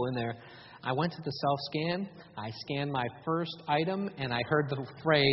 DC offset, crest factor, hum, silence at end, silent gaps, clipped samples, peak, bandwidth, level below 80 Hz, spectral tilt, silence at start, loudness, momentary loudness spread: under 0.1%; 20 dB; none; 0 s; none; under 0.1%; -12 dBFS; 5.8 kHz; -64 dBFS; -4 dB/octave; 0 s; -32 LUFS; 11 LU